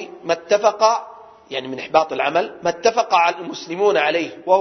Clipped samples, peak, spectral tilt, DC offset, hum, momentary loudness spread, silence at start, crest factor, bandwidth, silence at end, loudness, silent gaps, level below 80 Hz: under 0.1%; 0 dBFS; -3 dB/octave; under 0.1%; none; 12 LU; 0 s; 18 dB; 6.4 kHz; 0 s; -19 LUFS; none; -64 dBFS